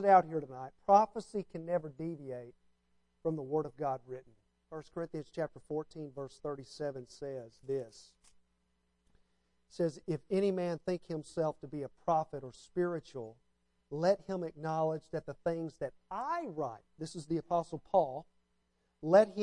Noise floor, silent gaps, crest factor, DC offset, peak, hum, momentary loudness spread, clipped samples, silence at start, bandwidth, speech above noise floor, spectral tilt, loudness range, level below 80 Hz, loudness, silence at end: -78 dBFS; none; 24 dB; under 0.1%; -12 dBFS; none; 18 LU; under 0.1%; 0 s; 11 kHz; 43 dB; -7 dB/octave; 8 LU; -70 dBFS; -36 LUFS; 0 s